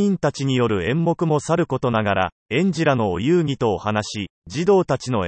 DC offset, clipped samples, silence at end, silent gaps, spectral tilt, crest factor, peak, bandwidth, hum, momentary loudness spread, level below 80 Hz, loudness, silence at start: under 0.1%; under 0.1%; 0 s; 2.32-2.46 s, 4.30-4.42 s; -6.5 dB/octave; 16 dB; -4 dBFS; 8.8 kHz; none; 5 LU; -52 dBFS; -21 LUFS; 0 s